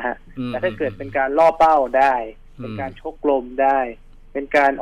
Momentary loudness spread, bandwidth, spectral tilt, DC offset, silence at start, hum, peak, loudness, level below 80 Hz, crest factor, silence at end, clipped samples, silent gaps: 15 LU; 10.5 kHz; -6.5 dB/octave; under 0.1%; 0 s; none; -6 dBFS; -19 LUFS; -44 dBFS; 14 dB; 0 s; under 0.1%; none